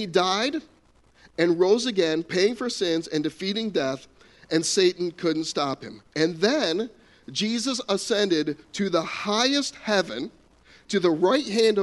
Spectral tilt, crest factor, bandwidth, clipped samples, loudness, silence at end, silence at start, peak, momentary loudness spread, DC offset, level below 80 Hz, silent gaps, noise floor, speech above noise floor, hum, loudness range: -4 dB/octave; 20 dB; 11.5 kHz; under 0.1%; -24 LUFS; 0 s; 0 s; -6 dBFS; 9 LU; under 0.1%; -64 dBFS; none; -58 dBFS; 34 dB; none; 1 LU